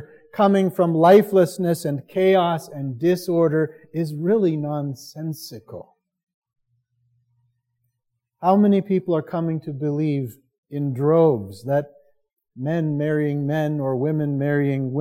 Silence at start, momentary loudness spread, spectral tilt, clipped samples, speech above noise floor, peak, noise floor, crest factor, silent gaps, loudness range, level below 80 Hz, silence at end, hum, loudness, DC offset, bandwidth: 0 s; 14 LU; -7.5 dB/octave; under 0.1%; 57 dB; -2 dBFS; -78 dBFS; 18 dB; 6.23-6.27 s, 6.34-6.42 s, 10.58-10.63 s; 9 LU; -70 dBFS; 0 s; none; -21 LUFS; under 0.1%; 17 kHz